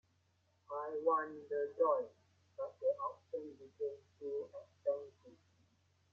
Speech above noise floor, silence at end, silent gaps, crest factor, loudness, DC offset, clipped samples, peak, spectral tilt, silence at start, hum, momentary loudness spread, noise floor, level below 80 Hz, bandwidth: 37 dB; 0.8 s; none; 20 dB; -40 LUFS; under 0.1%; under 0.1%; -22 dBFS; -7 dB/octave; 0.7 s; none; 15 LU; -76 dBFS; under -90 dBFS; 6.8 kHz